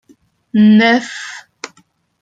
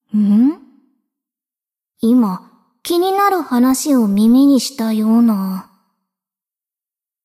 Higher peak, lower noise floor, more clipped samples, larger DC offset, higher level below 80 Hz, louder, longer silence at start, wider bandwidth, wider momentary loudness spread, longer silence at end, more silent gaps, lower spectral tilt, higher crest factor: about the same, -2 dBFS vs -4 dBFS; second, -55 dBFS vs under -90 dBFS; neither; neither; about the same, -60 dBFS vs -58 dBFS; first, -11 LUFS vs -14 LUFS; first, 0.55 s vs 0.15 s; second, 7.8 kHz vs 15.5 kHz; first, 23 LU vs 12 LU; second, 0.55 s vs 1.65 s; neither; about the same, -5.5 dB/octave vs -5.5 dB/octave; about the same, 14 dB vs 12 dB